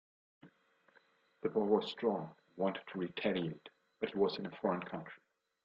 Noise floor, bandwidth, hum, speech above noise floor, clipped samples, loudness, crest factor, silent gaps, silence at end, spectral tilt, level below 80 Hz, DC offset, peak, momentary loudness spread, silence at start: -71 dBFS; 7.4 kHz; none; 34 dB; under 0.1%; -37 LUFS; 22 dB; none; 0.5 s; -7.5 dB/octave; -78 dBFS; under 0.1%; -18 dBFS; 14 LU; 0.45 s